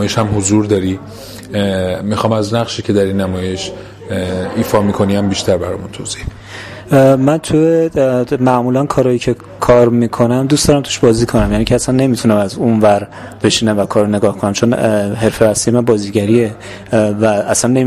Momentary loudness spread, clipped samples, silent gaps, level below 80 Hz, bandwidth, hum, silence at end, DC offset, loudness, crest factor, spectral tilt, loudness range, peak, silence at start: 11 LU; under 0.1%; none; -34 dBFS; 15.5 kHz; none; 0 s; under 0.1%; -13 LUFS; 12 dB; -5.5 dB/octave; 5 LU; 0 dBFS; 0 s